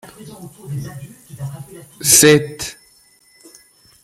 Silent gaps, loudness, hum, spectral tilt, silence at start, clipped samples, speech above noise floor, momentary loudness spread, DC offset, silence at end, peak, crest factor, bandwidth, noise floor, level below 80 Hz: none; -11 LUFS; none; -3 dB/octave; 0.2 s; under 0.1%; 35 dB; 28 LU; under 0.1%; 1.3 s; 0 dBFS; 20 dB; 16.5 kHz; -52 dBFS; -52 dBFS